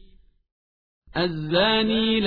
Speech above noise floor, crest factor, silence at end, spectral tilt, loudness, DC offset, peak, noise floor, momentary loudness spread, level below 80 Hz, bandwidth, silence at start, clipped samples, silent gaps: 32 dB; 16 dB; 0 s; -7.5 dB/octave; -22 LUFS; under 0.1%; -8 dBFS; -53 dBFS; 7 LU; -48 dBFS; 5 kHz; 1.15 s; under 0.1%; none